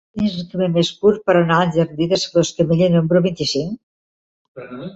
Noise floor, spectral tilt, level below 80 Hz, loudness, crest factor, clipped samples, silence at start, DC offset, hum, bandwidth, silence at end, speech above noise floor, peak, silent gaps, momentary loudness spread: under -90 dBFS; -6 dB/octave; -52 dBFS; -17 LUFS; 16 dB; under 0.1%; 0.15 s; under 0.1%; none; 8 kHz; 0.05 s; over 73 dB; -2 dBFS; 3.83-4.55 s; 9 LU